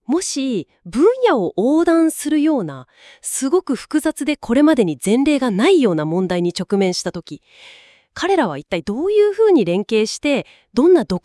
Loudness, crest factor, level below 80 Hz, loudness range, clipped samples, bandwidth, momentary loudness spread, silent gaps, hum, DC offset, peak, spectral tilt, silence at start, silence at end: -17 LUFS; 16 dB; -52 dBFS; 3 LU; under 0.1%; 12 kHz; 10 LU; none; none; under 0.1%; -2 dBFS; -5 dB/octave; 0.1 s; 0.05 s